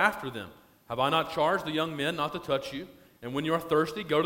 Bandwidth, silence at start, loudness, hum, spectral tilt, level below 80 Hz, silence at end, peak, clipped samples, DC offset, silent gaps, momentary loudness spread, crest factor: 16.5 kHz; 0 s; -29 LUFS; none; -5 dB/octave; -62 dBFS; 0 s; -8 dBFS; under 0.1%; under 0.1%; none; 15 LU; 22 dB